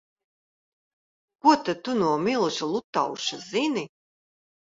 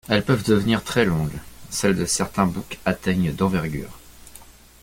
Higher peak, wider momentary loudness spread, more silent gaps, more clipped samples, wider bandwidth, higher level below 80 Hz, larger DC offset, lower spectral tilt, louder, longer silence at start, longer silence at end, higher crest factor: second, -6 dBFS vs -2 dBFS; about the same, 8 LU vs 10 LU; first, 2.84-2.93 s vs none; neither; second, 7.8 kHz vs 17 kHz; second, -70 dBFS vs -44 dBFS; neither; about the same, -4 dB/octave vs -5 dB/octave; second, -25 LUFS vs -22 LUFS; first, 1.45 s vs 0.1 s; first, 0.8 s vs 0.3 s; about the same, 22 dB vs 20 dB